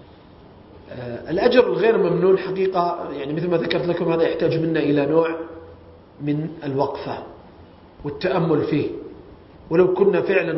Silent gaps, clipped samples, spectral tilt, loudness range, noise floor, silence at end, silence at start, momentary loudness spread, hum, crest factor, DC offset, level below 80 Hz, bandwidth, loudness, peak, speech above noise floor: none; under 0.1%; -11 dB/octave; 6 LU; -46 dBFS; 0 s; 0.75 s; 16 LU; none; 20 dB; under 0.1%; -54 dBFS; 5.8 kHz; -20 LUFS; -2 dBFS; 26 dB